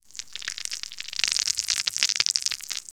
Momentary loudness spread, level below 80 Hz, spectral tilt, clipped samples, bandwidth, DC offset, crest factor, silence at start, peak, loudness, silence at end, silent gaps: 11 LU; -62 dBFS; 3.5 dB/octave; under 0.1%; over 20 kHz; under 0.1%; 28 dB; 0.15 s; 0 dBFS; -25 LUFS; 0.1 s; none